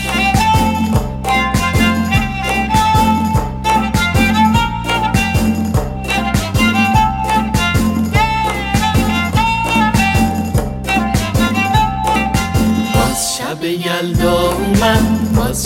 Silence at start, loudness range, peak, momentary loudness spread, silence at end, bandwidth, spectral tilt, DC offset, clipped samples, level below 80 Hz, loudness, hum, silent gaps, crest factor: 0 s; 1 LU; 0 dBFS; 5 LU; 0 s; 17 kHz; -5 dB/octave; under 0.1%; under 0.1%; -24 dBFS; -14 LUFS; none; none; 14 dB